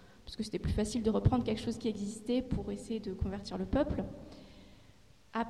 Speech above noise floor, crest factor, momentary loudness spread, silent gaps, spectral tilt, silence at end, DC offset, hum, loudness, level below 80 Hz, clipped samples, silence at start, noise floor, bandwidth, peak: 28 dB; 20 dB; 16 LU; none; -6.5 dB/octave; 0 s; under 0.1%; none; -35 LUFS; -46 dBFS; under 0.1%; 0 s; -62 dBFS; 12.5 kHz; -14 dBFS